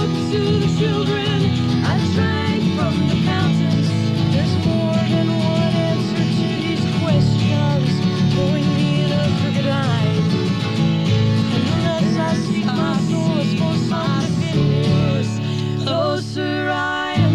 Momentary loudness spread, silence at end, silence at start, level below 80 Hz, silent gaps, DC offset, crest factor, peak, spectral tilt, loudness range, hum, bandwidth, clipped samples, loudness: 3 LU; 0 s; 0 s; -44 dBFS; none; 0.3%; 12 dB; -6 dBFS; -7 dB/octave; 1 LU; none; 11 kHz; under 0.1%; -18 LUFS